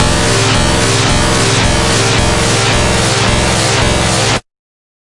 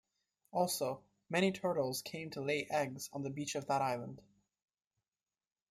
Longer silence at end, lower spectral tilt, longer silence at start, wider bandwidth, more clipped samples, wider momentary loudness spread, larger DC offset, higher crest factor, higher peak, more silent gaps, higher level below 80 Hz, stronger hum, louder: second, 0.8 s vs 1.5 s; about the same, -3.5 dB/octave vs -4.5 dB/octave; second, 0 s vs 0.55 s; second, 11.5 kHz vs 16 kHz; neither; second, 1 LU vs 9 LU; neither; second, 12 dB vs 20 dB; first, 0 dBFS vs -18 dBFS; neither; first, -22 dBFS vs -78 dBFS; neither; first, -10 LUFS vs -37 LUFS